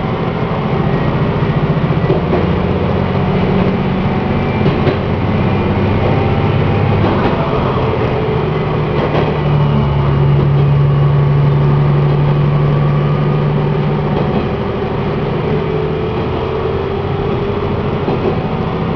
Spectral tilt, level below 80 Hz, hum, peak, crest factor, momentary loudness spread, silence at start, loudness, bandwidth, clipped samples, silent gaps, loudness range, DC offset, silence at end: -9.5 dB/octave; -28 dBFS; none; 0 dBFS; 14 dB; 5 LU; 0 s; -14 LUFS; 5.4 kHz; under 0.1%; none; 5 LU; under 0.1%; 0 s